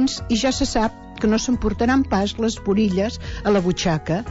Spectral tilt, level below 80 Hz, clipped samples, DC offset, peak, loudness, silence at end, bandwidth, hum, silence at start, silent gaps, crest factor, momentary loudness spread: -5 dB/octave; -36 dBFS; under 0.1%; under 0.1%; -6 dBFS; -21 LUFS; 0 s; 8 kHz; none; 0 s; none; 14 dB; 5 LU